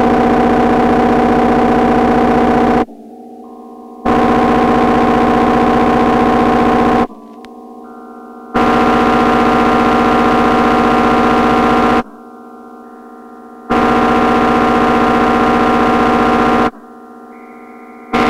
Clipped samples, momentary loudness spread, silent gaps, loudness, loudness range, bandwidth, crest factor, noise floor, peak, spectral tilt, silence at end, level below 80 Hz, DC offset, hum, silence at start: under 0.1%; 5 LU; none; -11 LUFS; 3 LU; 12.5 kHz; 12 dB; -35 dBFS; 0 dBFS; -6.5 dB/octave; 0 s; -32 dBFS; under 0.1%; none; 0 s